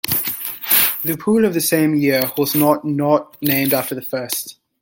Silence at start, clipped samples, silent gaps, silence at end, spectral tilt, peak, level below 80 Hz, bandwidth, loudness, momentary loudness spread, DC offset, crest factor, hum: 0.05 s; under 0.1%; none; 0.3 s; -4 dB/octave; 0 dBFS; -58 dBFS; 17 kHz; -17 LUFS; 10 LU; under 0.1%; 18 dB; none